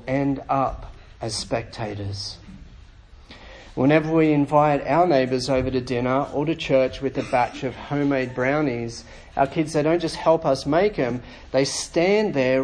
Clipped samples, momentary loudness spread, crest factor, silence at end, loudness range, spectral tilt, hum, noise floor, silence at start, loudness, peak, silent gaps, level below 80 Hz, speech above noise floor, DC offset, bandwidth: under 0.1%; 13 LU; 20 dB; 0 s; 7 LU; -5.5 dB/octave; none; -46 dBFS; 0 s; -22 LUFS; -4 dBFS; none; -46 dBFS; 25 dB; under 0.1%; 10.5 kHz